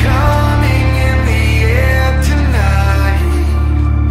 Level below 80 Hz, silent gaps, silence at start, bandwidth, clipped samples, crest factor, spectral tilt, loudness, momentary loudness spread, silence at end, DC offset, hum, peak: -14 dBFS; none; 0 s; 14.5 kHz; under 0.1%; 10 dB; -6.5 dB/octave; -12 LUFS; 2 LU; 0 s; under 0.1%; none; 0 dBFS